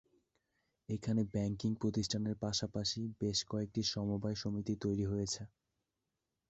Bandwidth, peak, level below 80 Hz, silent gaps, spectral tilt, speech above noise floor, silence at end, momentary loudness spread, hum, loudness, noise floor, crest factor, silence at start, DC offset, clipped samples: 8 kHz; -22 dBFS; -60 dBFS; none; -6 dB/octave; 51 dB; 1 s; 4 LU; none; -37 LUFS; -88 dBFS; 16 dB; 0.9 s; under 0.1%; under 0.1%